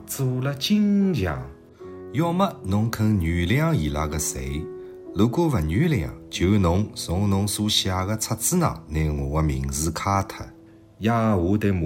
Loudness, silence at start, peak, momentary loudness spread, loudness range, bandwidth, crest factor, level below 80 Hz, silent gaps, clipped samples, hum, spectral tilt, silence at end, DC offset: -23 LUFS; 0 s; -8 dBFS; 11 LU; 2 LU; 16.5 kHz; 16 dB; -38 dBFS; none; under 0.1%; none; -5.5 dB/octave; 0 s; under 0.1%